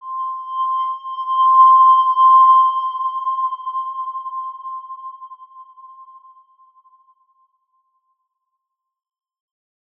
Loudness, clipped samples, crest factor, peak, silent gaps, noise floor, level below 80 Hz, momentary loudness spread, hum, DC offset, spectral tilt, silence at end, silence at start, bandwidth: -15 LUFS; under 0.1%; 16 dB; -4 dBFS; none; -78 dBFS; under -90 dBFS; 21 LU; none; under 0.1%; 0.5 dB/octave; 3.95 s; 0.05 s; 3.4 kHz